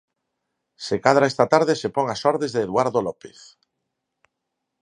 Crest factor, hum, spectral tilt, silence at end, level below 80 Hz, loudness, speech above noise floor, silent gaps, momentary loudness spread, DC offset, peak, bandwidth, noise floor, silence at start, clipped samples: 22 dB; none; -5 dB/octave; 1.55 s; -62 dBFS; -21 LUFS; 59 dB; none; 11 LU; under 0.1%; 0 dBFS; 11 kHz; -80 dBFS; 0.8 s; under 0.1%